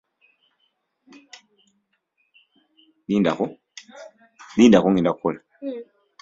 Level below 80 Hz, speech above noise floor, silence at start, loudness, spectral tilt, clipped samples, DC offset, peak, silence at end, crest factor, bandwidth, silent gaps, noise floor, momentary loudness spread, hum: -60 dBFS; 52 dB; 3.1 s; -20 LUFS; -6.5 dB/octave; under 0.1%; under 0.1%; -2 dBFS; 0.4 s; 22 dB; 7.8 kHz; none; -71 dBFS; 28 LU; none